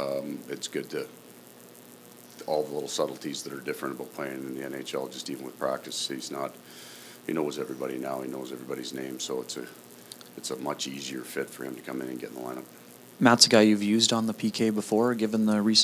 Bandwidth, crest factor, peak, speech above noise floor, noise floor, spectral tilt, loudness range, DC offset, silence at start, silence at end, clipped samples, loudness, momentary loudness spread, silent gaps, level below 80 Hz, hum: 16 kHz; 26 dB; -2 dBFS; 22 dB; -50 dBFS; -3.5 dB/octave; 12 LU; under 0.1%; 0 s; 0 s; under 0.1%; -28 LUFS; 22 LU; none; -78 dBFS; 60 Hz at -55 dBFS